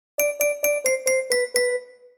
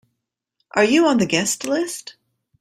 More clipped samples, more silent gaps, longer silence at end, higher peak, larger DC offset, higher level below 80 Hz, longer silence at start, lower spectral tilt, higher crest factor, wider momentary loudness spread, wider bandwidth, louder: neither; neither; second, 0.25 s vs 0.5 s; second, -6 dBFS vs -2 dBFS; neither; second, -70 dBFS vs -62 dBFS; second, 0.2 s vs 0.75 s; second, 1 dB/octave vs -3.5 dB/octave; about the same, 18 dB vs 18 dB; second, 4 LU vs 11 LU; first, over 20 kHz vs 15.5 kHz; second, -22 LUFS vs -19 LUFS